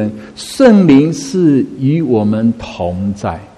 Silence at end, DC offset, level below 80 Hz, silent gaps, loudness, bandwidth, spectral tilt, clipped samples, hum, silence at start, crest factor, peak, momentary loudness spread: 0.1 s; under 0.1%; -42 dBFS; none; -12 LUFS; 12.5 kHz; -7 dB/octave; 0.2%; none; 0 s; 12 dB; 0 dBFS; 13 LU